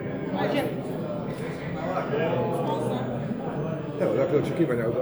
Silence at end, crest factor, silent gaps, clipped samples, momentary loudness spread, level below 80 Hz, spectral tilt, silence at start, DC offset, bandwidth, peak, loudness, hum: 0 s; 16 dB; none; under 0.1%; 7 LU; -56 dBFS; -7.5 dB/octave; 0 s; under 0.1%; over 20 kHz; -10 dBFS; -28 LUFS; none